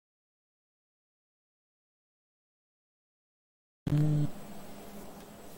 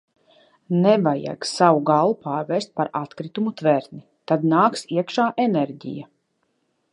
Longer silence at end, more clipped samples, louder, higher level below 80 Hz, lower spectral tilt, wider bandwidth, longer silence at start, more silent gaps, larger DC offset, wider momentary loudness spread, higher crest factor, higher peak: second, 0 s vs 0.9 s; neither; second, -31 LUFS vs -21 LUFS; first, -60 dBFS vs -72 dBFS; first, -8 dB/octave vs -6.5 dB/octave; first, 16.5 kHz vs 11.5 kHz; first, 3.85 s vs 0.7 s; neither; neither; first, 20 LU vs 13 LU; about the same, 20 dB vs 20 dB; second, -18 dBFS vs -2 dBFS